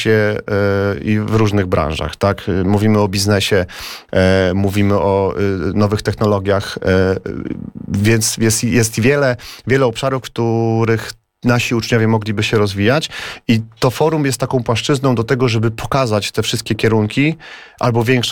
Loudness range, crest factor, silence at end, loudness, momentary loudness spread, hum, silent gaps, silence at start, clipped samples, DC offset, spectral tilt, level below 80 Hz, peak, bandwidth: 1 LU; 14 dB; 0 s; -16 LUFS; 6 LU; none; none; 0 s; under 0.1%; 0.3%; -5.5 dB/octave; -40 dBFS; -2 dBFS; 18.5 kHz